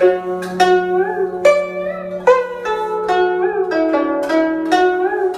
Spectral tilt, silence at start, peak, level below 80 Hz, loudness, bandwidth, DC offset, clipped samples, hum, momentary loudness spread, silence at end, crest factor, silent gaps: -5 dB/octave; 0 s; 0 dBFS; -54 dBFS; -16 LUFS; 12.5 kHz; under 0.1%; under 0.1%; none; 7 LU; 0 s; 16 dB; none